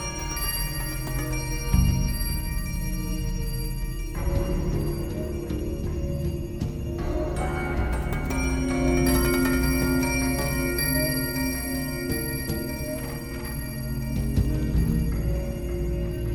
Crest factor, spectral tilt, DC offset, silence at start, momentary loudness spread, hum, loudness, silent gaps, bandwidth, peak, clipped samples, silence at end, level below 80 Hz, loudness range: 16 dB; -5 dB/octave; under 0.1%; 0 s; 8 LU; none; -27 LUFS; none; 18 kHz; -8 dBFS; under 0.1%; 0 s; -30 dBFS; 6 LU